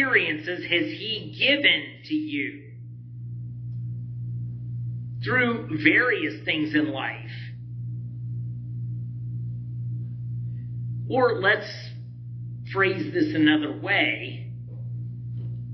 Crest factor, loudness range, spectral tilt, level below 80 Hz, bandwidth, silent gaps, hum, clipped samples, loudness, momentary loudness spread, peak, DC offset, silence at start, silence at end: 24 dB; 9 LU; -7.5 dB/octave; -58 dBFS; 6.2 kHz; none; none; under 0.1%; -25 LUFS; 16 LU; -4 dBFS; under 0.1%; 0 s; 0 s